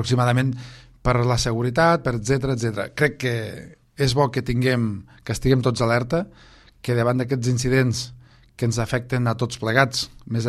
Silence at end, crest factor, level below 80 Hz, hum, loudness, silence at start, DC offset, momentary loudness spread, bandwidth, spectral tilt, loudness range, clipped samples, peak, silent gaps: 0 s; 20 dB; -40 dBFS; none; -22 LUFS; 0 s; under 0.1%; 10 LU; 13 kHz; -5.5 dB/octave; 2 LU; under 0.1%; -2 dBFS; none